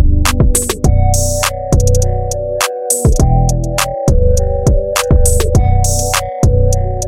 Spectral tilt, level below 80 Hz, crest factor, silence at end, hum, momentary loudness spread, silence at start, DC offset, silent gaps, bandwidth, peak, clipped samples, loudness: -4.5 dB/octave; -14 dBFS; 10 dB; 0 s; none; 4 LU; 0 s; under 0.1%; none; 16.5 kHz; 0 dBFS; under 0.1%; -13 LUFS